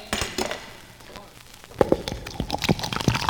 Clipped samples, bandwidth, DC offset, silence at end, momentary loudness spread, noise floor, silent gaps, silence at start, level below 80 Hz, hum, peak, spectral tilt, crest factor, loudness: under 0.1%; over 20 kHz; under 0.1%; 0 s; 20 LU; -46 dBFS; none; 0 s; -42 dBFS; none; 0 dBFS; -4.5 dB/octave; 26 dB; -26 LUFS